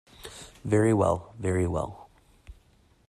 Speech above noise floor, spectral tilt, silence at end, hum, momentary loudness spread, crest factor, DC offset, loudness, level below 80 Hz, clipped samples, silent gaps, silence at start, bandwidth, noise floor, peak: 36 dB; -7 dB/octave; 0.55 s; none; 20 LU; 20 dB; under 0.1%; -27 LUFS; -52 dBFS; under 0.1%; none; 0.2 s; 13.5 kHz; -61 dBFS; -10 dBFS